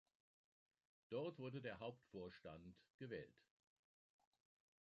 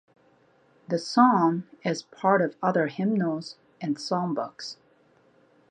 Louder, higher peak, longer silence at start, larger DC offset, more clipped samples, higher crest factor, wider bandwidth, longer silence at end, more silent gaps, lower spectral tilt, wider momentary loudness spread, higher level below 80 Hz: second, -54 LUFS vs -26 LUFS; second, -36 dBFS vs -6 dBFS; first, 1.1 s vs 0.9 s; neither; neither; about the same, 20 dB vs 22 dB; second, 7.2 kHz vs 9.6 kHz; first, 1.5 s vs 1 s; first, 2.90-2.99 s vs none; about the same, -5.5 dB/octave vs -6 dB/octave; second, 11 LU vs 16 LU; second, -82 dBFS vs -76 dBFS